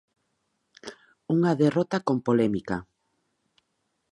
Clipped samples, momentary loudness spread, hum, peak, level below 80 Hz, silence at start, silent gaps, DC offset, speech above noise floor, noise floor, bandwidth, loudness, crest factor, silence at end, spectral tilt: under 0.1%; 22 LU; none; -10 dBFS; -62 dBFS; 0.85 s; none; under 0.1%; 52 dB; -76 dBFS; 11 kHz; -25 LUFS; 18 dB; 1.3 s; -7.5 dB/octave